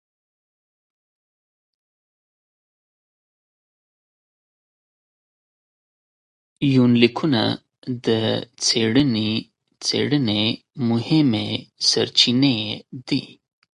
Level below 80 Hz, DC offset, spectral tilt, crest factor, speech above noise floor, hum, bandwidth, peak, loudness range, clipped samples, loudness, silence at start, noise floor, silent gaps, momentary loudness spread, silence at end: -60 dBFS; under 0.1%; -4.5 dB/octave; 22 dB; over 70 dB; none; 11.5 kHz; 0 dBFS; 3 LU; under 0.1%; -20 LUFS; 6.6 s; under -90 dBFS; 7.78-7.82 s; 10 LU; 0.5 s